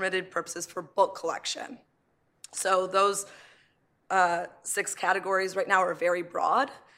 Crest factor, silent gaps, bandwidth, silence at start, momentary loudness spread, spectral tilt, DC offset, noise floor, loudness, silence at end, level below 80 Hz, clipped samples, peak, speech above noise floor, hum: 20 dB; none; 16 kHz; 0 s; 10 LU; -2 dB/octave; under 0.1%; -71 dBFS; -28 LUFS; 0.2 s; -80 dBFS; under 0.1%; -8 dBFS; 43 dB; none